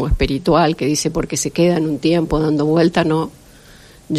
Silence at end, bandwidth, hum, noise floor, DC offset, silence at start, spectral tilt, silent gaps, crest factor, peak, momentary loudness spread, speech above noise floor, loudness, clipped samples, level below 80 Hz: 0 s; 14 kHz; none; -43 dBFS; under 0.1%; 0 s; -5.5 dB/octave; none; 16 dB; -2 dBFS; 5 LU; 27 dB; -17 LUFS; under 0.1%; -30 dBFS